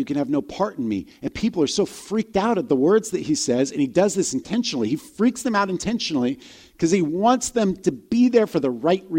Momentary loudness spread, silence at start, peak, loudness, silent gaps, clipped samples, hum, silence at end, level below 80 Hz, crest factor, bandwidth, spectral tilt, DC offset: 7 LU; 0 s; -4 dBFS; -22 LUFS; none; under 0.1%; none; 0 s; -54 dBFS; 18 dB; 16.5 kHz; -5 dB/octave; under 0.1%